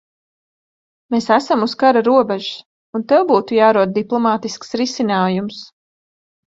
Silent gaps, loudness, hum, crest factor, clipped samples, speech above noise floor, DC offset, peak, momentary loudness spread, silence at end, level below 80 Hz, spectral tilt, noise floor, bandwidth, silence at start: 2.66-2.93 s; -16 LUFS; none; 18 dB; under 0.1%; over 74 dB; under 0.1%; 0 dBFS; 14 LU; 0.85 s; -62 dBFS; -5.5 dB/octave; under -90 dBFS; 7.8 kHz; 1.1 s